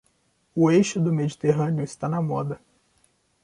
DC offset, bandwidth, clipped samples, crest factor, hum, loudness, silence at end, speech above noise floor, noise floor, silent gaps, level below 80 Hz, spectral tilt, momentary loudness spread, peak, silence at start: under 0.1%; 11 kHz; under 0.1%; 18 dB; none; -24 LUFS; 0.85 s; 45 dB; -67 dBFS; none; -62 dBFS; -7 dB/octave; 13 LU; -6 dBFS; 0.55 s